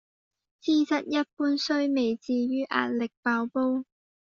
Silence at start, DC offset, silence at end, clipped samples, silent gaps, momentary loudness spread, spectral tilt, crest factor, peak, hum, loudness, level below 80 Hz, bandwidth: 0.65 s; under 0.1%; 0.5 s; under 0.1%; 1.33-1.37 s, 3.17-3.23 s; 4 LU; -2 dB/octave; 20 dB; -8 dBFS; none; -27 LUFS; -74 dBFS; 7.4 kHz